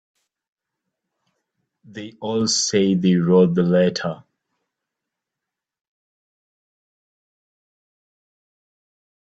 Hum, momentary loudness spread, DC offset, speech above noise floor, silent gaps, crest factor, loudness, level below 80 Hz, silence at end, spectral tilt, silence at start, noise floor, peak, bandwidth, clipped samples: none; 19 LU; under 0.1%; 67 dB; none; 20 dB; -18 LUFS; -64 dBFS; 5.15 s; -5 dB/octave; 1.95 s; -85 dBFS; -4 dBFS; 8.8 kHz; under 0.1%